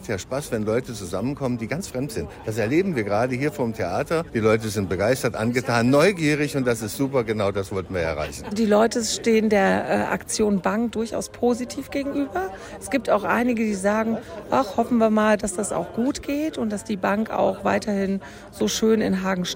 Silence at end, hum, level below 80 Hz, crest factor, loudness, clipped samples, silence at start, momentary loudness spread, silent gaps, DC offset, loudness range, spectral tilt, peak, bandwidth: 0 s; none; -48 dBFS; 16 dB; -23 LUFS; under 0.1%; 0 s; 9 LU; none; under 0.1%; 3 LU; -5 dB/octave; -6 dBFS; 16.5 kHz